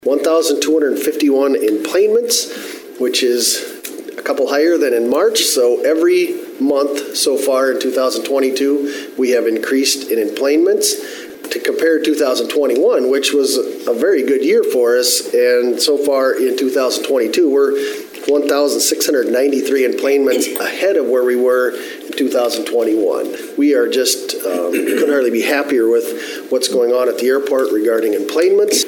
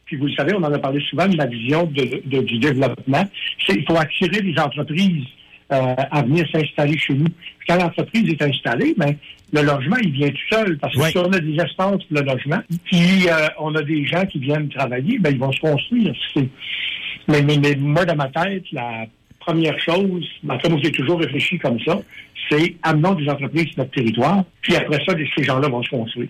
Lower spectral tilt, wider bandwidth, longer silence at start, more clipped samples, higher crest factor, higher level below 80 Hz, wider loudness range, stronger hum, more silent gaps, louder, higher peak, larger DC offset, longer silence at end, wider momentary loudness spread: second, -1.5 dB/octave vs -6.5 dB/octave; first, 17.5 kHz vs 15 kHz; about the same, 0.05 s vs 0.05 s; neither; about the same, 14 dB vs 10 dB; second, -72 dBFS vs -54 dBFS; about the same, 2 LU vs 2 LU; neither; neither; first, -15 LUFS vs -19 LUFS; first, -2 dBFS vs -8 dBFS; neither; about the same, 0 s vs 0 s; about the same, 7 LU vs 6 LU